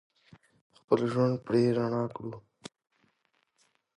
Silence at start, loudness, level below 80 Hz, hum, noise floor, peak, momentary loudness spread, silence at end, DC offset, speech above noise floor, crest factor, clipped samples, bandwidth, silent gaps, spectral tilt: 0.9 s; -29 LUFS; -70 dBFS; none; -75 dBFS; -10 dBFS; 24 LU; 1.6 s; under 0.1%; 47 dB; 22 dB; under 0.1%; 10.5 kHz; none; -8 dB/octave